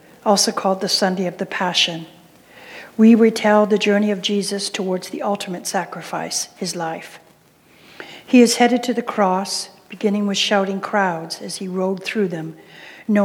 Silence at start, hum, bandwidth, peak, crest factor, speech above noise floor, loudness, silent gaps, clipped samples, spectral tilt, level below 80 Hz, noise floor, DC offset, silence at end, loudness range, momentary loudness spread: 0.25 s; none; 17 kHz; -2 dBFS; 18 dB; 34 dB; -19 LUFS; none; under 0.1%; -4 dB/octave; -72 dBFS; -52 dBFS; under 0.1%; 0 s; 7 LU; 19 LU